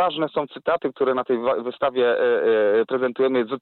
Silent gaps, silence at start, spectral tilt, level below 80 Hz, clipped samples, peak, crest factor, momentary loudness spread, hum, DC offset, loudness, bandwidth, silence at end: none; 0 s; -9 dB/octave; -66 dBFS; under 0.1%; -12 dBFS; 10 dB; 6 LU; none; under 0.1%; -22 LUFS; 4.3 kHz; 0.05 s